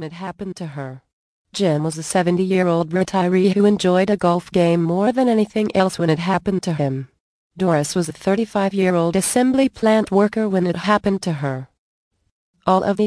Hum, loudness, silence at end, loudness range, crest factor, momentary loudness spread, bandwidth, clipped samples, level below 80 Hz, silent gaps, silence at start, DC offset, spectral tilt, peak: none; -18 LUFS; 0 s; 3 LU; 16 dB; 13 LU; 11 kHz; under 0.1%; -54 dBFS; 1.13-1.45 s, 7.20-7.50 s, 11.78-12.11 s, 12.31-12.54 s; 0 s; under 0.1%; -6 dB/octave; -2 dBFS